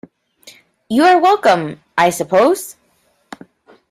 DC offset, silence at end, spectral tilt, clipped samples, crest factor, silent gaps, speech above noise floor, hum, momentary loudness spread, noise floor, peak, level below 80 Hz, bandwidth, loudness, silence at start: under 0.1%; 1.2 s; -4.5 dB/octave; under 0.1%; 16 dB; none; 47 dB; none; 11 LU; -60 dBFS; -2 dBFS; -60 dBFS; 16 kHz; -14 LUFS; 0.9 s